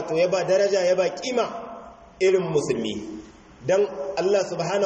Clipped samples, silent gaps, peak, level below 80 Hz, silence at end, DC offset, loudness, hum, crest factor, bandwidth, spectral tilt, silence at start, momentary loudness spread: under 0.1%; none; -10 dBFS; -58 dBFS; 0 s; under 0.1%; -23 LUFS; none; 14 dB; 8.4 kHz; -4.5 dB/octave; 0 s; 15 LU